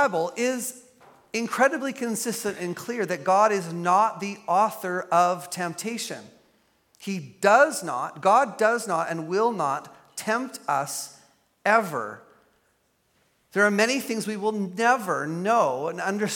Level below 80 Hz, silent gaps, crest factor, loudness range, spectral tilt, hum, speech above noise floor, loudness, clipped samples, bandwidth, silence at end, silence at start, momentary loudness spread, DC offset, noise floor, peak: -78 dBFS; none; 22 dB; 4 LU; -4 dB/octave; none; 44 dB; -25 LUFS; under 0.1%; 17.5 kHz; 0 s; 0 s; 12 LU; under 0.1%; -68 dBFS; -4 dBFS